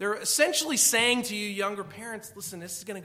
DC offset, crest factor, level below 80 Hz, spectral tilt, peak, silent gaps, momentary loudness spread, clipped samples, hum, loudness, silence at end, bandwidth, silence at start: under 0.1%; 20 dB; -74 dBFS; -1 dB/octave; -8 dBFS; none; 17 LU; under 0.1%; none; -24 LUFS; 0 s; 16.5 kHz; 0 s